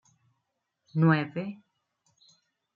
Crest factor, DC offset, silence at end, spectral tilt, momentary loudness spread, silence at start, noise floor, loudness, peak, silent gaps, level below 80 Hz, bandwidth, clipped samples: 22 dB; under 0.1%; 1.2 s; -9 dB/octave; 17 LU; 0.95 s; -81 dBFS; -27 LUFS; -10 dBFS; none; -78 dBFS; 6.6 kHz; under 0.1%